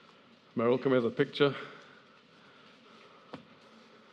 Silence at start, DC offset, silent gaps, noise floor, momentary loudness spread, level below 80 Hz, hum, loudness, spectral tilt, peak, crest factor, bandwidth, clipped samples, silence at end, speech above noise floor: 0.55 s; under 0.1%; none; -59 dBFS; 23 LU; -88 dBFS; none; -30 LUFS; -7.5 dB/octave; -12 dBFS; 22 dB; 7.8 kHz; under 0.1%; 0.75 s; 31 dB